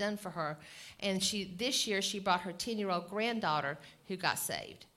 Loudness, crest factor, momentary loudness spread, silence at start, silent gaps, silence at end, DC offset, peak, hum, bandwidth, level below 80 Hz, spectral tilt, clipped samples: -35 LUFS; 22 dB; 9 LU; 0 s; none; 0.1 s; under 0.1%; -14 dBFS; none; 16.5 kHz; -70 dBFS; -3 dB/octave; under 0.1%